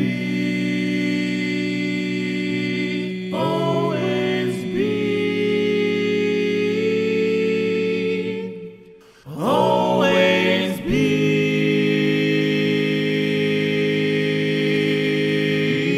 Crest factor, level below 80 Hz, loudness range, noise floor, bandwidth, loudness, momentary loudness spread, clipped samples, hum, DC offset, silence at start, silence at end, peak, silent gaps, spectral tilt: 16 dB; -52 dBFS; 4 LU; -46 dBFS; 14.5 kHz; -20 LUFS; 6 LU; under 0.1%; none; under 0.1%; 0 s; 0 s; -4 dBFS; none; -6.5 dB/octave